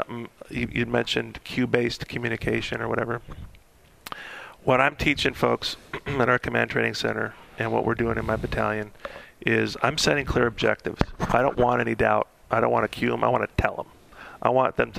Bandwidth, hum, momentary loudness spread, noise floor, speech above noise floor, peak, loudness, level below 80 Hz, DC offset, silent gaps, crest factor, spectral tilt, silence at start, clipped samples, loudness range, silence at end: 15.5 kHz; none; 15 LU; -54 dBFS; 30 dB; 0 dBFS; -25 LUFS; -42 dBFS; under 0.1%; none; 26 dB; -5 dB/octave; 0 s; under 0.1%; 4 LU; 0 s